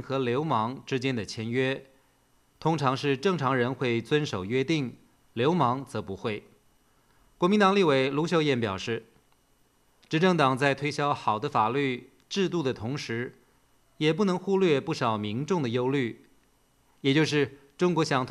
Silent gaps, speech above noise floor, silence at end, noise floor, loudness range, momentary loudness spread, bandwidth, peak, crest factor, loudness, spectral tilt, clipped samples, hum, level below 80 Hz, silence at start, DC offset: none; 39 dB; 0 s; -65 dBFS; 3 LU; 10 LU; 12.5 kHz; -8 dBFS; 20 dB; -27 LUFS; -6 dB/octave; under 0.1%; none; -66 dBFS; 0 s; under 0.1%